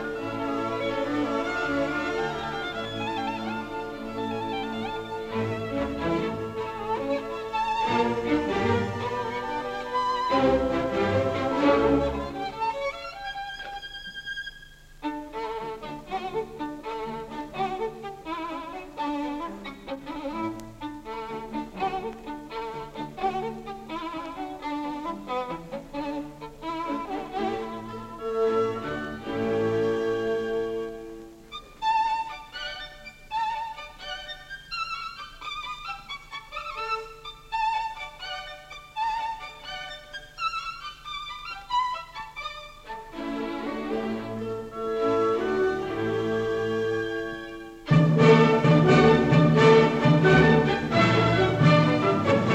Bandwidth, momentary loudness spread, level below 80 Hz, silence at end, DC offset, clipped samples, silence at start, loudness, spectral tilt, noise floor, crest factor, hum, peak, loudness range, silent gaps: 9.4 kHz; 17 LU; -48 dBFS; 0 s; under 0.1%; under 0.1%; 0 s; -27 LUFS; -7 dB/octave; -48 dBFS; 20 dB; none; -6 dBFS; 14 LU; none